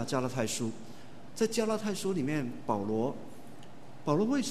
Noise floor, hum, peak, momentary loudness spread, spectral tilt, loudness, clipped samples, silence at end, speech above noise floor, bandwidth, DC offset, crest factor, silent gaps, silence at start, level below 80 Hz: -51 dBFS; none; -14 dBFS; 21 LU; -5 dB/octave; -32 LUFS; under 0.1%; 0 s; 20 dB; 13.5 kHz; 0.8%; 20 dB; none; 0 s; -68 dBFS